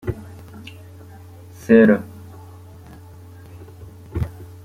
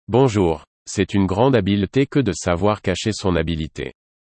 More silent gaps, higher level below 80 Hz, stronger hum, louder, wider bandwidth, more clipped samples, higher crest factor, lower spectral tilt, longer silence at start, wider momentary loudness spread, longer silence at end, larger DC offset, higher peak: second, none vs 0.67-0.86 s; about the same, -44 dBFS vs -44 dBFS; neither; about the same, -18 LUFS vs -20 LUFS; first, 15 kHz vs 8.8 kHz; neither; about the same, 22 dB vs 18 dB; first, -8 dB/octave vs -6 dB/octave; about the same, 0.05 s vs 0.1 s; first, 29 LU vs 12 LU; second, 0.2 s vs 0.35 s; neither; about the same, -2 dBFS vs -2 dBFS